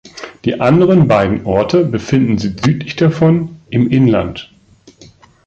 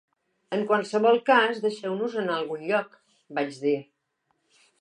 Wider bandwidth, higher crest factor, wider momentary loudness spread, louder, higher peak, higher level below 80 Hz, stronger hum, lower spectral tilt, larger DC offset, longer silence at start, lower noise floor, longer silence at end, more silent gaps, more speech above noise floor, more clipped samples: second, 7.8 kHz vs 10 kHz; second, 12 dB vs 20 dB; about the same, 10 LU vs 11 LU; first, -13 LUFS vs -25 LUFS; first, -2 dBFS vs -8 dBFS; first, -40 dBFS vs -84 dBFS; neither; first, -8 dB/octave vs -5 dB/octave; neither; second, 0.15 s vs 0.5 s; second, -45 dBFS vs -75 dBFS; about the same, 1 s vs 0.95 s; neither; second, 33 dB vs 50 dB; neither